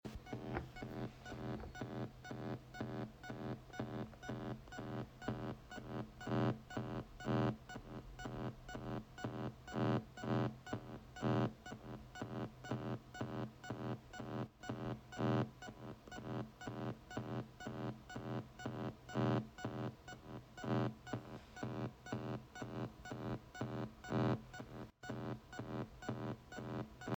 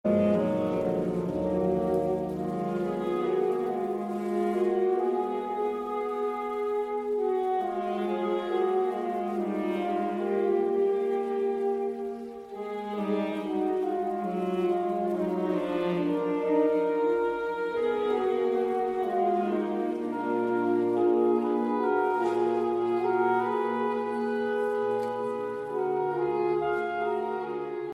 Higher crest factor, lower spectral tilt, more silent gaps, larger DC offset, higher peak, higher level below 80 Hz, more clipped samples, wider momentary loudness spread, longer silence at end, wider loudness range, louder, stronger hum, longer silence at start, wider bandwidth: first, 20 dB vs 14 dB; about the same, -7 dB/octave vs -8 dB/octave; neither; neither; second, -24 dBFS vs -14 dBFS; about the same, -64 dBFS vs -62 dBFS; neither; first, 11 LU vs 6 LU; about the same, 0 s vs 0 s; about the same, 5 LU vs 3 LU; second, -45 LUFS vs -28 LUFS; neither; about the same, 0.05 s vs 0.05 s; first, 19.5 kHz vs 11 kHz